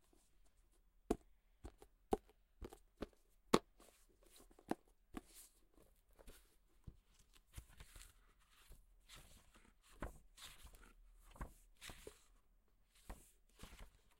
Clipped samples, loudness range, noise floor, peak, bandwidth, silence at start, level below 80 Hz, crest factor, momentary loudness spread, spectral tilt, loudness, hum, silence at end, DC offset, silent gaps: under 0.1%; 17 LU; -74 dBFS; -12 dBFS; 16 kHz; 1.1 s; -64 dBFS; 40 dB; 22 LU; -4.5 dB/octave; -49 LUFS; none; 0.3 s; under 0.1%; none